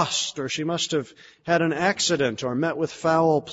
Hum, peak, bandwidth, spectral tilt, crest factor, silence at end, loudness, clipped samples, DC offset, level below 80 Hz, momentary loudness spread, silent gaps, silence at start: none; -6 dBFS; 8 kHz; -3.5 dB/octave; 18 dB; 0 s; -24 LUFS; under 0.1%; under 0.1%; -62 dBFS; 7 LU; none; 0 s